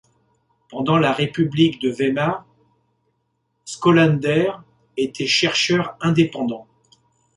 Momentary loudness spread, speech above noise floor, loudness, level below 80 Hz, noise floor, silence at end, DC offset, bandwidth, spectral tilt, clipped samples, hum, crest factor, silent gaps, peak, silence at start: 15 LU; 52 dB; -19 LUFS; -56 dBFS; -71 dBFS; 0.75 s; under 0.1%; 11 kHz; -5.5 dB/octave; under 0.1%; none; 18 dB; none; -2 dBFS; 0.7 s